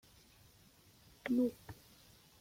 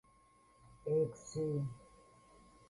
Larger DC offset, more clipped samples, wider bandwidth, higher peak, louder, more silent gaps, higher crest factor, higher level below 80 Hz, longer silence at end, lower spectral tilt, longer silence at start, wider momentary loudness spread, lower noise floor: neither; neither; first, 16.5 kHz vs 11.5 kHz; about the same, -24 dBFS vs -24 dBFS; about the same, -37 LUFS vs -39 LUFS; neither; about the same, 18 dB vs 16 dB; about the same, -70 dBFS vs -70 dBFS; second, 0.7 s vs 0.85 s; second, -6 dB/octave vs -7.5 dB/octave; first, 1.25 s vs 0.7 s; first, 26 LU vs 12 LU; about the same, -65 dBFS vs -68 dBFS